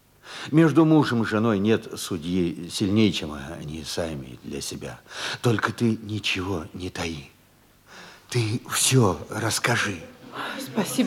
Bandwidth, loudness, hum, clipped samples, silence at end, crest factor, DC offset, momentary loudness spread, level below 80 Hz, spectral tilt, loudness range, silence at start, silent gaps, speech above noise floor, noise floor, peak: 17 kHz; -24 LUFS; none; under 0.1%; 0 s; 20 dB; under 0.1%; 17 LU; -56 dBFS; -4.5 dB/octave; 6 LU; 0.25 s; none; 33 dB; -57 dBFS; -6 dBFS